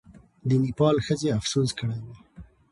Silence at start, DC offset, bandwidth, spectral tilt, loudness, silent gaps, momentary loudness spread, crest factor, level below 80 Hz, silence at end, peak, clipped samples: 0.45 s; under 0.1%; 11.5 kHz; -6 dB/octave; -25 LUFS; none; 12 LU; 16 dB; -52 dBFS; 0.3 s; -10 dBFS; under 0.1%